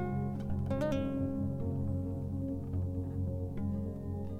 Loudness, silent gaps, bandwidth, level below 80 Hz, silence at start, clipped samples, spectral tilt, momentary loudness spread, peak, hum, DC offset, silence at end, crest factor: -36 LUFS; none; 8 kHz; -48 dBFS; 0 s; under 0.1%; -9.5 dB/octave; 4 LU; -22 dBFS; none; under 0.1%; 0 s; 12 dB